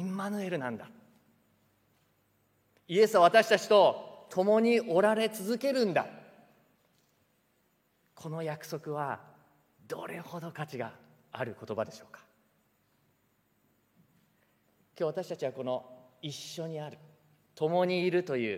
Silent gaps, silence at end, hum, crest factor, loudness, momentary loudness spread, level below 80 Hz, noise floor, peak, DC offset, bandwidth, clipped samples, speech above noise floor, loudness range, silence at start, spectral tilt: none; 0 s; none; 24 dB; -30 LUFS; 19 LU; -86 dBFS; -73 dBFS; -8 dBFS; under 0.1%; 16 kHz; under 0.1%; 43 dB; 17 LU; 0 s; -5 dB/octave